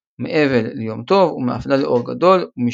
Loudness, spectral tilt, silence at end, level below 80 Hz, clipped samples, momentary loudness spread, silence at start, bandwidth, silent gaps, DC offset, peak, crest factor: -17 LUFS; -7.5 dB/octave; 0 s; -52 dBFS; under 0.1%; 8 LU; 0.2 s; 7.6 kHz; none; under 0.1%; -2 dBFS; 16 dB